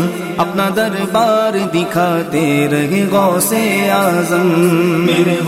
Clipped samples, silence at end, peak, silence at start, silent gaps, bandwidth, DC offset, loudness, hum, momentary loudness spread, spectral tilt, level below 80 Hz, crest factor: under 0.1%; 0 s; 0 dBFS; 0 s; none; 16 kHz; under 0.1%; -14 LUFS; none; 4 LU; -5 dB/octave; -54 dBFS; 12 dB